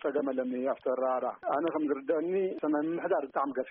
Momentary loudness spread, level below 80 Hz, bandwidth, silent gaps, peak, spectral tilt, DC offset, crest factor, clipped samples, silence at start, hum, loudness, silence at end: 2 LU; -80 dBFS; 3.9 kHz; none; -18 dBFS; -5.5 dB/octave; under 0.1%; 14 dB; under 0.1%; 0 s; none; -31 LUFS; 0 s